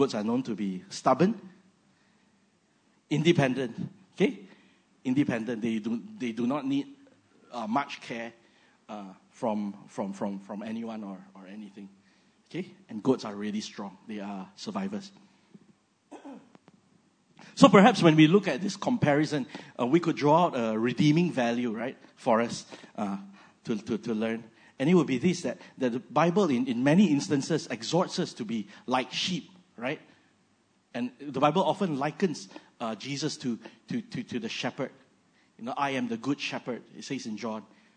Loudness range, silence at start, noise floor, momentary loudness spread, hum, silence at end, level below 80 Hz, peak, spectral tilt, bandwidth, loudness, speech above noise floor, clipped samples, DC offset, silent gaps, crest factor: 13 LU; 0 s; -68 dBFS; 17 LU; none; 0.3 s; -74 dBFS; 0 dBFS; -6 dB/octave; 9.6 kHz; -28 LUFS; 40 dB; under 0.1%; under 0.1%; none; 28 dB